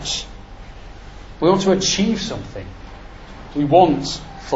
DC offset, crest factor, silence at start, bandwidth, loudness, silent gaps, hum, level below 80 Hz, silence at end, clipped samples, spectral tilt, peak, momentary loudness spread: under 0.1%; 20 dB; 0 s; 8 kHz; -18 LUFS; none; none; -38 dBFS; 0 s; under 0.1%; -4.5 dB/octave; 0 dBFS; 26 LU